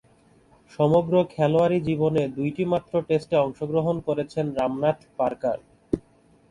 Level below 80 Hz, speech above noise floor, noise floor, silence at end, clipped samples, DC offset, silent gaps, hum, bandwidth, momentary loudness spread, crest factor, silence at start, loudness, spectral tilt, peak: -54 dBFS; 35 dB; -58 dBFS; 0.5 s; under 0.1%; under 0.1%; none; none; 11 kHz; 8 LU; 18 dB; 0.8 s; -24 LUFS; -8.5 dB/octave; -6 dBFS